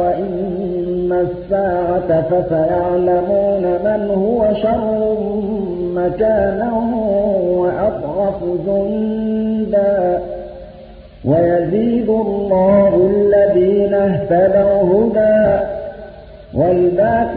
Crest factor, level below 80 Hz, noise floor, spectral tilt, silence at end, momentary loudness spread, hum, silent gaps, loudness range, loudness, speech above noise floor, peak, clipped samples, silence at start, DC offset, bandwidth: 12 dB; -38 dBFS; -37 dBFS; -13.5 dB/octave; 0 s; 8 LU; none; none; 4 LU; -15 LUFS; 22 dB; -2 dBFS; under 0.1%; 0 s; under 0.1%; 4.6 kHz